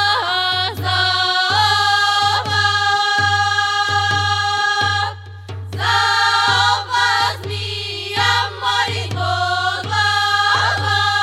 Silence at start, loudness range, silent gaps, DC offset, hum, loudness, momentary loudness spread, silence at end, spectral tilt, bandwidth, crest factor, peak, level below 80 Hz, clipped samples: 0 s; 3 LU; none; under 0.1%; none; -16 LUFS; 8 LU; 0 s; -2 dB/octave; 15 kHz; 14 dB; -2 dBFS; -60 dBFS; under 0.1%